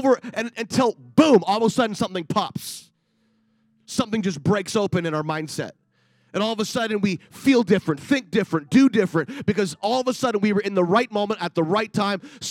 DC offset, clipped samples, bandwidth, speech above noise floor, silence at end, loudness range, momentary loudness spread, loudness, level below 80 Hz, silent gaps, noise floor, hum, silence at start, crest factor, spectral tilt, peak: under 0.1%; under 0.1%; 16 kHz; 45 dB; 0 s; 5 LU; 11 LU; -22 LUFS; -64 dBFS; none; -66 dBFS; none; 0 s; 20 dB; -5.5 dB/octave; -2 dBFS